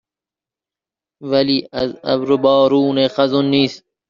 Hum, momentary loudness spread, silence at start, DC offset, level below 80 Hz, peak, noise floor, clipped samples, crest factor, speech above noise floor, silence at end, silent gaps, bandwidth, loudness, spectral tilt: none; 8 LU; 1.2 s; under 0.1%; -56 dBFS; -2 dBFS; -89 dBFS; under 0.1%; 14 dB; 73 dB; 0.3 s; none; 7.2 kHz; -16 LUFS; -4.5 dB/octave